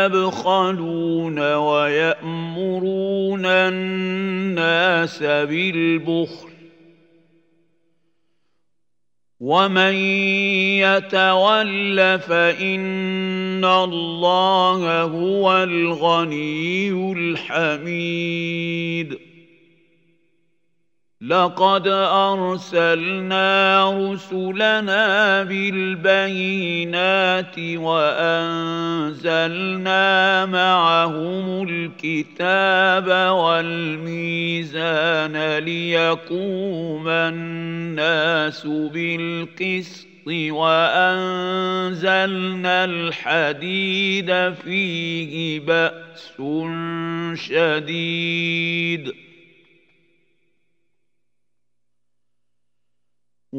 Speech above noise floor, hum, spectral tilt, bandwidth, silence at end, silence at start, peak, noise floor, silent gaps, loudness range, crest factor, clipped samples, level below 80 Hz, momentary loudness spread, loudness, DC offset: 63 dB; none; -5.5 dB/octave; 8 kHz; 0 s; 0 s; -2 dBFS; -82 dBFS; none; 6 LU; 20 dB; under 0.1%; -76 dBFS; 9 LU; -19 LUFS; under 0.1%